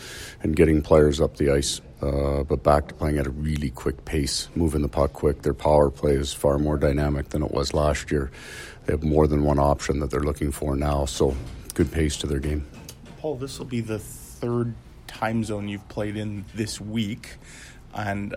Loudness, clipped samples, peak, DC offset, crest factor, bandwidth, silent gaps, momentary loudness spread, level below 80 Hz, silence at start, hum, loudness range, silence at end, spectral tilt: -24 LUFS; under 0.1%; -4 dBFS; under 0.1%; 20 dB; 16 kHz; none; 13 LU; -34 dBFS; 0 s; none; 7 LU; 0 s; -6 dB/octave